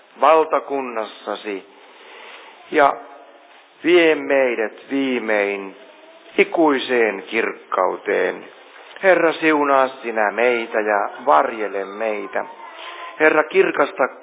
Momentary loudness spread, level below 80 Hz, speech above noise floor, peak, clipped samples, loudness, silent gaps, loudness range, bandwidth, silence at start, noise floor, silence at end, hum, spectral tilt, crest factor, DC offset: 16 LU; -76 dBFS; 29 dB; 0 dBFS; under 0.1%; -19 LUFS; none; 3 LU; 4 kHz; 0.2 s; -47 dBFS; 0 s; none; -8 dB/octave; 18 dB; under 0.1%